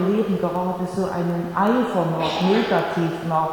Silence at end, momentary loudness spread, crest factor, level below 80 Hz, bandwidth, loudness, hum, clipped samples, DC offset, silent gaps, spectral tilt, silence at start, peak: 0 s; 5 LU; 16 dB; -54 dBFS; 18.5 kHz; -22 LUFS; none; under 0.1%; under 0.1%; none; -7 dB/octave; 0 s; -6 dBFS